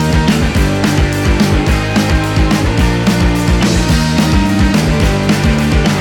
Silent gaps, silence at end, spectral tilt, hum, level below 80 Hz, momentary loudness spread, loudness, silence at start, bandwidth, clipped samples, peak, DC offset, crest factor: none; 0 s; -5.5 dB/octave; none; -18 dBFS; 1 LU; -12 LUFS; 0 s; 19 kHz; under 0.1%; 0 dBFS; under 0.1%; 10 dB